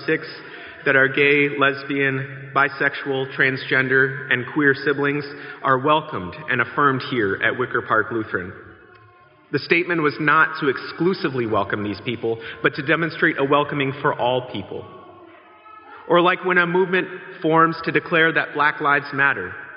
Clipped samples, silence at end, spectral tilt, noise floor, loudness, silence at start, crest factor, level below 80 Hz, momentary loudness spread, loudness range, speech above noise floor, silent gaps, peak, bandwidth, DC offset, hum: under 0.1%; 0 s; -3 dB/octave; -51 dBFS; -20 LUFS; 0 s; 20 dB; -64 dBFS; 11 LU; 4 LU; 30 dB; none; 0 dBFS; 5.6 kHz; under 0.1%; none